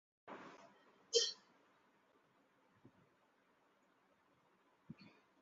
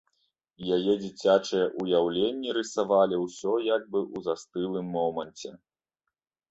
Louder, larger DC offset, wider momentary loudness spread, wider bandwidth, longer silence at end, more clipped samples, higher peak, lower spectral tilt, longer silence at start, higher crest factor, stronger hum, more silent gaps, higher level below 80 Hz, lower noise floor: second, -38 LUFS vs -27 LUFS; neither; first, 25 LU vs 9 LU; second, 7.4 kHz vs 8.2 kHz; second, 0.5 s vs 0.95 s; neither; second, -20 dBFS vs -8 dBFS; second, -0.5 dB/octave vs -5 dB/octave; second, 0.25 s vs 0.6 s; first, 30 dB vs 20 dB; neither; neither; second, under -90 dBFS vs -68 dBFS; second, -76 dBFS vs -86 dBFS